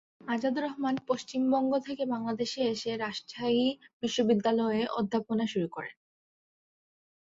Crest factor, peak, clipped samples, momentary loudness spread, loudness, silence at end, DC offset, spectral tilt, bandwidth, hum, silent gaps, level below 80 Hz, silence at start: 16 dB; -14 dBFS; under 0.1%; 8 LU; -30 LUFS; 1.3 s; under 0.1%; -5 dB/octave; 7.8 kHz; none; 3.93-4.00 s; -72 dBFS; 0.25 s